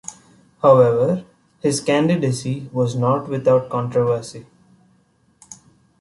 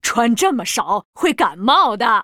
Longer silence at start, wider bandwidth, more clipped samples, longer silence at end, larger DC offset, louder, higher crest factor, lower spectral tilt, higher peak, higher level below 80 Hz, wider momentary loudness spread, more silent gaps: about the same, 0.1 s vs 0.05 s; second, 11.5 kHz vs 18 kHz; neither; first, 0.45 s vs 0 s; neither; second, -19 LUFS vs -16 LUFS; about the same, 18 dB vs 16 dB; first, -6.5 dB/octave vs -2.5 dB/octave; about the same, -2 dBFS vs 0 dBFS; about the same, -58 dBFS vs -54 dBFS; first, 12 LU vs 6 LU; second, none vs 1.05-1.13 s